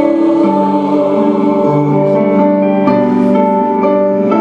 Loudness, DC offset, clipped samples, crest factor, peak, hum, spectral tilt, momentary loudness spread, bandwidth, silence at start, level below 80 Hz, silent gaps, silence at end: -11 LUFS; under 0.1%; under 0.1%; 10 dB; 0 dBFS; none; -9.5 dB/octave; 1 LU; 7 kHz; 0 s; -54 dBFS; none; 0 s